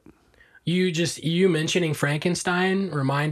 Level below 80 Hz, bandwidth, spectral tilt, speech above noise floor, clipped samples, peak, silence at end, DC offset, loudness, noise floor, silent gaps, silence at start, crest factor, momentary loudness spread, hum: -62 dBFS; 14 kHz; -5 dB/octave; 33 dB; under 0.1%; -8 dBFS; 0 s; under 0.1%; -23 LUFS; -56 dBFS; none; 0.65 s; 16 dB; 4 LU; none